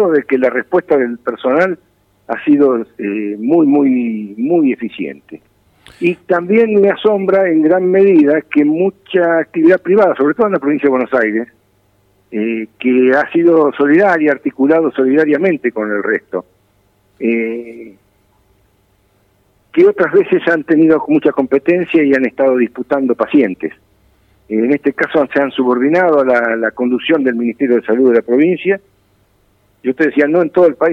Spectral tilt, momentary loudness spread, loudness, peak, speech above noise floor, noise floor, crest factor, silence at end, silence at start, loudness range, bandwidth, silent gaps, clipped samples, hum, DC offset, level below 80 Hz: -8 dB/octave; 9 LU; -13 LUFS; -2 dBFS; 43 dB; -56 dBFS; 12 dB; 0 s; 0 s; 5 LU; 5.8 kHz; none; under 0.1%; none; under 0.1%; -60 dBFS